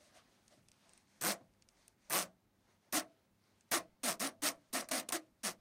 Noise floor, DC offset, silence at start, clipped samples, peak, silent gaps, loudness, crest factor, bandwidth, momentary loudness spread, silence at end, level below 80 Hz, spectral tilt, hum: -75 dBFS; under 0.1%; 1.2 s; under 0.1%; -18 dBFS; none; -39 LUFS; 26 dB; 16 kHz; 6 LU; 0.05 s; -84 dBFS; -0.5 dB/octave; none